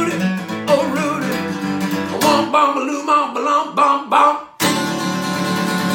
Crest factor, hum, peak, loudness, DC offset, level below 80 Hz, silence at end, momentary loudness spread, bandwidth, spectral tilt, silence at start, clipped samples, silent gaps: 16 dB; none; 0 dBFS; -17 LUFS; under 0.1%; -60 dBFS; 0 s; 7 LU; 17.5 kHz; -4.5 dB/octave; 0 s; under 0.1%; none